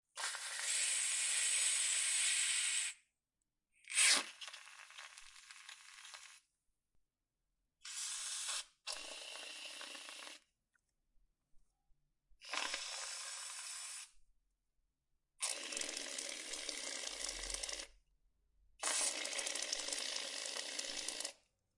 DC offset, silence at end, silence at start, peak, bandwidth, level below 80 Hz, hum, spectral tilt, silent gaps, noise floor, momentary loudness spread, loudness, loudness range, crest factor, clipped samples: under 0.1%; 0.45 s; 0.15 s; -18 dBFS; 12 kHz; -72 dBFS; none; 3 dB/octave; none; under -90 dBFS; 21 LU; -38 LUFS; 15 LU; 26 dB; under 0.1%